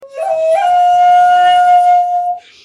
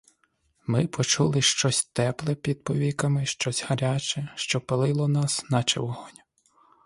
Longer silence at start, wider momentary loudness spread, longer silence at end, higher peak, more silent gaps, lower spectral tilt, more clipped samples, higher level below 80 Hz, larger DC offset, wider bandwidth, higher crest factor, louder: second, 0 s vs 0.7 s; about the same, 9 LU vs 8 LU; second, 0.25 s vs 0.75 s; first, -2 dBFS vs -8 dBFS; neither; second, -1 dB/octave vs -4 dB/octave; neither; second, -64 dBFS vs -58 dBFS; neither; about the same, 10.5 kHz vs 11.5 kHz; second, 8 dB vs 20 dB; first, -10 LUFS vs -25 LUFS